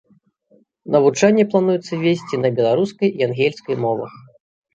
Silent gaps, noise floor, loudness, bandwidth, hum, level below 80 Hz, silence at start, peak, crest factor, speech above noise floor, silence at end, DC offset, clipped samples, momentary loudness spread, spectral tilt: none; -57 dBFS; -18 LUFS; 8.6 kHz; none; -64 dBFS; 0.85 s; -2 dBFS; 16 dB; 40 dB; 0.55 s; under 0.1%; under 0.1%; 8 LU; -6 dB/octave